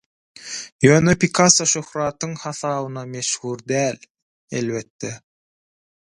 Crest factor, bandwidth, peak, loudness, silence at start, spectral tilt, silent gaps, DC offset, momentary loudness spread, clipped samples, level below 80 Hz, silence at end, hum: 22 dB; 11.5 kHz; 0 dBFS; -19 LUFS; 0.4 s; -4 dB/octave; 0.72-0.79 s, 4.10-4.15 s, 4.22-4.48 s, 4.90-4.99 s; under 0.1%; 18 LU; under 0.1%; -52 dBFS; 0.95 s; none